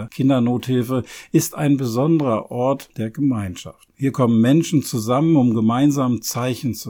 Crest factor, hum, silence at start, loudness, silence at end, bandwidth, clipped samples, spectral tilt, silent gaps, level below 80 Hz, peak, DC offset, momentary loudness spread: 14 dB; none; 0 s; -19 LUFS; 0 s; 18.5 kHz; under 0.1%; -6.5 dB/octave; none; -56 dBFS; -4 dBFS; under 0.1%; 9 LU